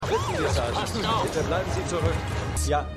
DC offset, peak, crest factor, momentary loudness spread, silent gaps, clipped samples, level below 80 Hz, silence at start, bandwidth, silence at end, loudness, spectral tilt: under 0.1%; -10 dBFS; 14 dB; 3 LU; none; under 0.1%; -36 dBFS; 0 s; 15 kHz; 0 s; -26 LUFS; -5 dB/octave